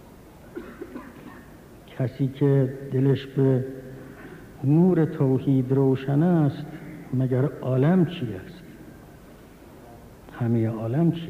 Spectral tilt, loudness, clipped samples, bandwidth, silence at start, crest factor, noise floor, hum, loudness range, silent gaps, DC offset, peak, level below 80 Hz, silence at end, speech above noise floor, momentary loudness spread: -9.5 dB/octave; -23 LUFS; under 0.1%; 14.5 kHz; 0.45 s; 14 dB; -47 dBFS; none; 5 LU; none; under 0.1%; -10 dBFS; -56 dBFS; 0 s; 25 dB; 22 LU